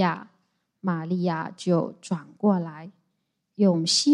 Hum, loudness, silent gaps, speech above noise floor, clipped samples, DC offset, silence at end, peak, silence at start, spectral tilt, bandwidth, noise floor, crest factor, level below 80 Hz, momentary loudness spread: none; -26 LUFS; none; 52 dB; under 0.1%; under 0.1%; 0 s; -10 dBFS; 0 s; -5 dB/octave; 11.5 kHz; -76 dBFS; 16 dB; -76 dBFS; 15 LU